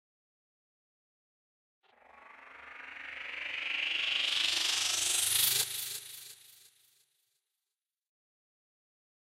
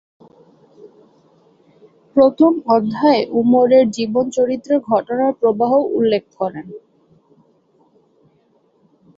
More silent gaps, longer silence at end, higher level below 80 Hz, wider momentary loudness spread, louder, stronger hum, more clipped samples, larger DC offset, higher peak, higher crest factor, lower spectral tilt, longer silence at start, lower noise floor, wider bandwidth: neither; first, 2.85 s vs 2.4 s; second, -80 dBFS vs -62 dBFS; first, 21 LU vs 9 LU; second, -30 LUFS vs -16 LUFS; neither; neither; neither; second, -14 dBFS vs -2 dBFS; first, 24 dB vs 16 dB; second, 2 dB/octave vs -6.5 dB/octave; about the same, 2.15 s vs 2.15 s; first, under -90 dBFS vs -58 dBFS; first, 16 kHz vs 7.8 kHz